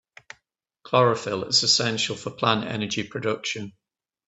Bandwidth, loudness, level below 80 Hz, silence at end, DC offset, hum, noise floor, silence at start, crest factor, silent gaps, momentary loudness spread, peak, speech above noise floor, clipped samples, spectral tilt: 8.4 kHz; -23 LUFS; -66 dBFS; 0.6 s; under 0.1%; none; -73 dBFS; 0.85 s; 22 dB; none; 10 LU; -4 dBFS; 49 dB; under 0.1%; -3 dB/octave